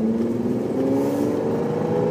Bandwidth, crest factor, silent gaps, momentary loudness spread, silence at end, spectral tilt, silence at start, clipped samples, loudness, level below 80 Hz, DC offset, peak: 16 kHz; 12 dB; none; 2 LU; 0 s; -8 dB/octave; 0 s; under 0.1%; -22 LUFS; -56 dBFS; under 0.1%; -10 dBFS